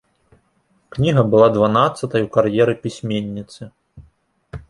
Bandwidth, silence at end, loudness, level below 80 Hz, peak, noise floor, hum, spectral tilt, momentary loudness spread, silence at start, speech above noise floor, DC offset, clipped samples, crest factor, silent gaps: 11.5 kHz; 0.1 s; -17 LUFS; -48 dBFS; 0 dBFS; -62 dBFS; none; -7 dB/octave; 19 LU; 0.95 s; 46 dB; under 0.1%; under 0.1%; 18 dB; none